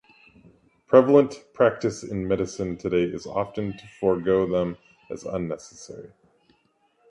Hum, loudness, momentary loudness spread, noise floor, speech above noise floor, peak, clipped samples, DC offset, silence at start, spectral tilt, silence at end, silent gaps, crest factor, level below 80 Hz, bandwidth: none; -24 LUFS; 20 LU; -66 dBFS; 43 dB; -2 dBFS; under 0.1%; under 0.1%; 0.9 s; -6.5 dB/octave; 1.05 s; none; 22 dB; -54 dBFS; 11 kHz